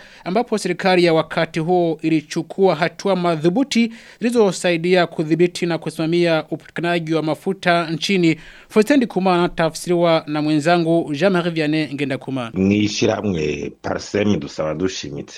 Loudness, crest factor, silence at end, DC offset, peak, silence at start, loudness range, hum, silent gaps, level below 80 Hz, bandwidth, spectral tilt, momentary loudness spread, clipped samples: -19 LUFS; 18 dB; 0 s; under 0.1%; 0 dBFS; 0 s; 2 LU; none; none; -52 dBFS; 13.5 kHz; -5.5 dB/octave; 7 LU; under 0.1%